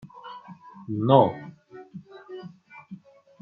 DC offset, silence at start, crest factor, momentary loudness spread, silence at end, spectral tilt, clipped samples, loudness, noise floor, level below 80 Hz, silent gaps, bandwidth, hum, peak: under 0.1%; 0.05 s; 24 dB; 27 LU; 0.45 s; -10 dB/octave; under 0.1%; -22 LUFS; -47 dBFS; -72 dBFS; none; 5.2 kHz; none; -4 dBFS